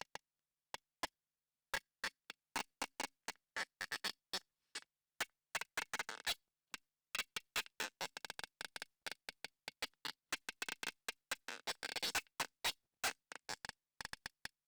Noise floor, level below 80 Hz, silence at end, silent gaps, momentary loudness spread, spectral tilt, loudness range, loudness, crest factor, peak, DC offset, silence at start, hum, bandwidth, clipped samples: under -90 dBFS; -76 dBFS; 0.4 s; none; 11 LU; 0 dB/octave; 4 LU; -45 LUFS; 14 dB; -34 dBFS; under 0.1%; 1.05 s; none; over 20 kHz; under 0.1%